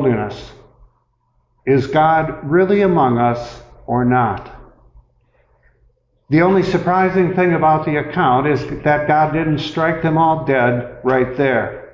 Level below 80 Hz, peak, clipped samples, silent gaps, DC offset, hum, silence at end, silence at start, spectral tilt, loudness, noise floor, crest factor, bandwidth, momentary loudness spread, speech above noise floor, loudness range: -44 dBFS; -4 dBFS; under 0.1%; none; under 0.1%; none; 0.05 s; 0 s; -8 dB/octave; -16 LUFS; -62 dBFS; 14 dB; 7.6 kHz; 7 LU; 47 dB; 4 LU